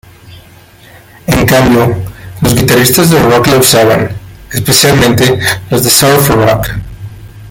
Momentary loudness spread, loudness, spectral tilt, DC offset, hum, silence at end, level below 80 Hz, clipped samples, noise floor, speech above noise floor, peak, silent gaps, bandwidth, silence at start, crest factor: 16 LU; -7 LUFS; -4 dB/octave; under 0.1%; none; 0 s; -30 dBFS; 0.3%; -37 dBFS; 30 dB; 0 dBFS; none; over 20 kHz; 0.25 s; 10 dB